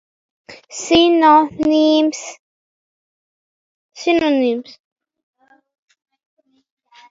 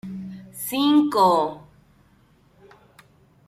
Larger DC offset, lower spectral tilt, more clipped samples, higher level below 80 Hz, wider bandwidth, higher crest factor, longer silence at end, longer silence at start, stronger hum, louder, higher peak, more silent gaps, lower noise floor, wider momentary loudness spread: neither; second, -3.5 dB/octave vs -5 dB/octave; neither; first, -54 dBFS vs -64 dBFS; second, 7.8 kHz vs 15.5 kHz; about the same, 18 dB vs 18 dB; first, 2.5 s vs 1.9 s; first, 0.5 s vs 0.05 s; neither; first, -15 LUFS vs -20 LUFS; first, 0 dBFS vs -8 dBFS; first, 2.39-3.89 s vs none; first, under -90 dBFS vs -58 dBFS; about the same, 18 LU vs 19 LU